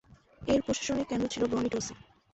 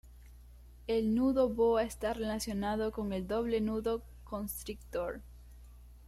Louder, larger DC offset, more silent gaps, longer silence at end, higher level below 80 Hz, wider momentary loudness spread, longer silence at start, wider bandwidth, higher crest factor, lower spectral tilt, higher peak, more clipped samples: first, -31 LUFS vs -34 LUFS; neither; neither; first, 0.35 s vs 0 s; about the same, -54 dBFS vs -52 dBFS; second, 8 LU vs 12 LU; first, 0.4 s vs 0.05 s; second, 8.4 kHz vs 16 kHz; about the same, 16 dB vs 18 dB; about the same, -4.5 dB/octave vs -5.5 dB/octave; about the same, -16 dBFS vs -18 dBFS; neither